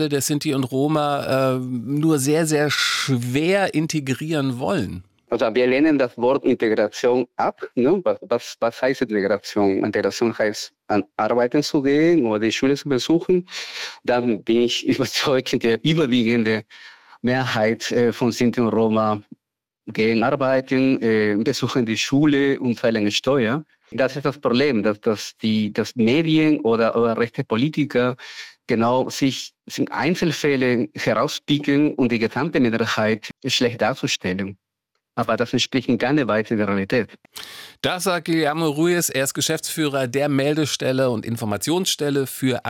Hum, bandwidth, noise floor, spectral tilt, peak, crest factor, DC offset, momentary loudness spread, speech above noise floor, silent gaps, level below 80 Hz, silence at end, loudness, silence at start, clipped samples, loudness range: none; 17 kHz; -82 dBFS; -5 dB/octave; -8 dBFS; 12 dB; under 0.1%; 6 LU; 62 dB; none; -58 dBFS; 0 s; -20 LUFS; 0 s; under 0.1%; 2 LU